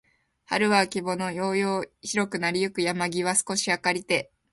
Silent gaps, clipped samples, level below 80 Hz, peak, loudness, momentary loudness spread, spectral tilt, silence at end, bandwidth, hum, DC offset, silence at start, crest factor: none; under 0.1%; -66 dBFS; -6 dBFS; -25 LUFS; 6 LU; -3 dB/octave; 0.3 s; 12 kHz; none; under 0.1%; 0.5 s; 20 dB